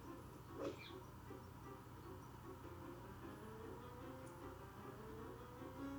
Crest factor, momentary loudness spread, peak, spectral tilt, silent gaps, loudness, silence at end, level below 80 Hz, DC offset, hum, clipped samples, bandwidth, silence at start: 20 dB; 6 LU; -34 dBFS; -6 dB/octave; none; -55 LUFS; 0 s; -66 dBFS; under 0.1%; none; under 0.1%; over 20 kHz; 0 s